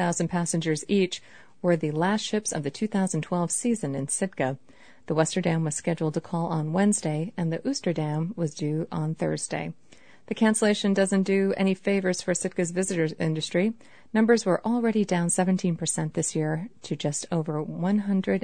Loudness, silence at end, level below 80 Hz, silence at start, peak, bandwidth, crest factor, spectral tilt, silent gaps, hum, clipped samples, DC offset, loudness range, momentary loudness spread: -26 LUFS; 0.05 s; -64 dBFS; 0 s; -8 dBFS; 9.6 kHz; 18 dB; -5 dB/octave; none; none; under 0.1%; 0.3%; 3 LU; 7 LU